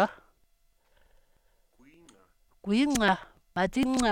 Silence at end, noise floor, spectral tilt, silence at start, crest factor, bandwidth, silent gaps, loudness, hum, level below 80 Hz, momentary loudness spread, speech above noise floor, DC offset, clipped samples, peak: 0 s; -68 dBFS; -4.5 dB/octave; 0 s; 20 dB; 17 kHz; none; -28 LUFS; none; -52 dBFS; 11 LU; 42 dB; under 0.1%; under 0.1%; -12 dBFS